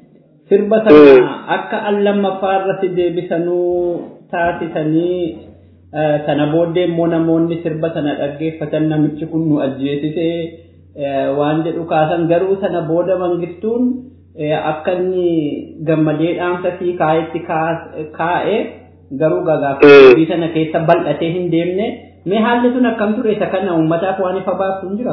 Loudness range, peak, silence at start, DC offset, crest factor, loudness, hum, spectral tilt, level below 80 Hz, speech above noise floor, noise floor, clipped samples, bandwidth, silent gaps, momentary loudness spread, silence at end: 7 LU; 0 dBFS; 0.5 s; under 0.1%; 14 dB; -15 LUFS; none; -9 dB/octave; -52 dBFS; 33 dB; -47 dBFS; 0.8%; 5.4 kHz; none; 9 LU; 0 s